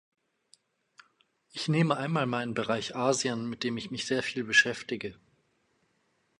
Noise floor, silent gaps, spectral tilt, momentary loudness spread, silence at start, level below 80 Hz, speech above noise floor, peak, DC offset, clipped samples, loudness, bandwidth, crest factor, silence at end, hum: -73 dBFS; none; -4 dB/octave; 12 LU; 1.55 s; -70 dBFS; 44 dB; -8 dBFS; under 0.1%; under 0.1%; -29 LUFS; 11.5 kHz; 24 dB; 1.25 s; none